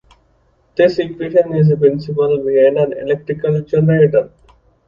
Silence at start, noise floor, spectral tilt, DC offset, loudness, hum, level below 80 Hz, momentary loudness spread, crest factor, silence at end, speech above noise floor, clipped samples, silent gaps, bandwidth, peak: 0.75 s; -56 dBFS; -9.5 dB/octave; under 0.1%; -15 LUFS; none; -50 dBFS; 8 LU; 14 dB; 0.6 s; 43 dB; under 0.1%; none; 6.8 kHz; 0 dBFS